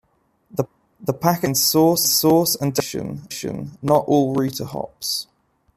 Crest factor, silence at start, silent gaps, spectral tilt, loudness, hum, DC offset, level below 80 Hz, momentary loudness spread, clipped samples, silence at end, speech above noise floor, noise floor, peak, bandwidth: 18 dB; 0.55 s; none; -4 dB/octave; -20 LUFS; none; under 0.1%; -56 dBFS; 14 LU; under 0.1%; 0.55 s; 42 dB; -61 dBFS; -2 dBFS; 15.5 kHz